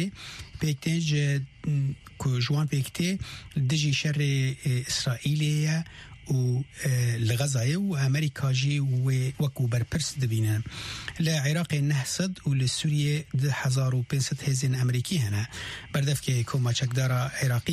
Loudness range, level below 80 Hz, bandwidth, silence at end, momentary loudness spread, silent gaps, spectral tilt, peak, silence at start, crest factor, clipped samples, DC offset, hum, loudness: 1 LU; -54 dBFS; 14 kHz; 0 s; 6 LU; none; -5 dB/octave; -14 dBFS; 0 s; 12 dB; under 0.1%; under 0.1%; none; -27 LUFS